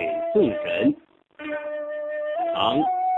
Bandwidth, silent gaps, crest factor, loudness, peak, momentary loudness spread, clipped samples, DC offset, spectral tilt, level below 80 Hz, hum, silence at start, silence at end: 4.1 kHz; none; 18 dB; -24 LUFS; -6 dBFS; 10 LU; under 0.1%; under 0.1%; -7.5 dB/octave; -60 dBFS; none; 0 s; 0 s